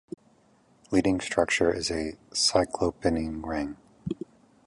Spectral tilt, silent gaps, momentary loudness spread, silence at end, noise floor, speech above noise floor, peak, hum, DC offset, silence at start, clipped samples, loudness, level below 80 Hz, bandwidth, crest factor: -3.5 dB/octave; none; 15 LU; 0.5 s; -62 dBFS; 35 dB; -6 dBFS; none; under 0.1%; 0.9 s; under 0.1%; -27 LUFS; -48 dBFS; 11.5 kHz; 22 dB